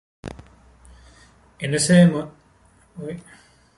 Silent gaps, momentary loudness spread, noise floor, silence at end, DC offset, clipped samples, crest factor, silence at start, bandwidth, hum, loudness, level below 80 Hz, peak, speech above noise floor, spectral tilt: none; 24 LU; -56 dBFS; 0.6 s; under 0.1%; under 0.1%; 20 dB; 0.25 s; 11.5 kHz; none; -18 LUFS; -52 dBFS; -4 dBFS; 37 dB; -5.5 dB/octave